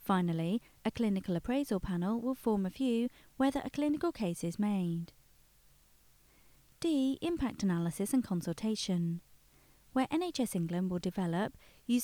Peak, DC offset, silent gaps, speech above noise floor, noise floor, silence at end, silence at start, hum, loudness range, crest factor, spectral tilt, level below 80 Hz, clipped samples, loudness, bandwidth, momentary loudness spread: -18 dBFS; under 0.1%; none; 31 dB; -65 dBFS; 0 s; 0 s; none; 3 LU; 16 dB; -6 dB/octave; -60 dBFS; under 0.1%; -34 LUFS; 20 kHz; 5 LU